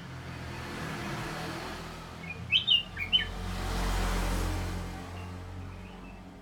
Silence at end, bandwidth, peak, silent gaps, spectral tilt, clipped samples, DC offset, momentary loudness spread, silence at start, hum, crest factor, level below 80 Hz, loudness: 0 s; 17 kHz; -12 dBFS; none; -3.5 dB/octave; under 0.1%; under 0.1%; 17 LU; 0 s; none; 20 dB; -40 dBFS; -31 LUFS